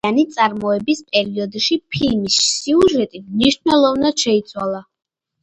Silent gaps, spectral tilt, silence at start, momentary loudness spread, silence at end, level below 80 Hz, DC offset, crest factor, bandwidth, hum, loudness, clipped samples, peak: none; -3.5 dB/octave; 0.05 s; 9 LU; 0.6 s; -48 dBFS; under 0.1%; 16 dB; 11 kHz; none; -17 LUFS; under 0.1%; 0 dBFS